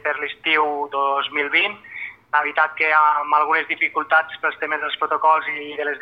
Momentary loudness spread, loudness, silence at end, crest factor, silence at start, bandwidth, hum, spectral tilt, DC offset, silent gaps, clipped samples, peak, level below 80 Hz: 8 LU; -19 LUFS; 0 s; 16 dB; 0.05 s; 5.6 kHz; none; -4 dB/octave; under 0.1%; none; under 0.1%; -4 dBFS; -72 dBFS